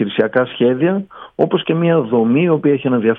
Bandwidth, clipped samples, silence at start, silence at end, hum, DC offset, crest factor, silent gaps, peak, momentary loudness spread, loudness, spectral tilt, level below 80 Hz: 4 kHz; under 0.1%; 0 s; 0 s; none; under 0.1%; 14 dB; none; -2 dBFS; 5 LU; -15 LUFS; -10.5 dB/octave; -60 dBFS